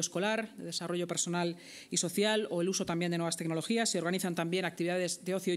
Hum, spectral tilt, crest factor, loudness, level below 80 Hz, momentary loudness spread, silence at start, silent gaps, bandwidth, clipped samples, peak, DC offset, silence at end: none; -3.5 dB/octave; 16 dB; -33 LUFS; -76 dBFS; 6 LU; 0 s; none; 15.5 kHz; under 0.1%; -18 dBFS; under 0.1%; 0 s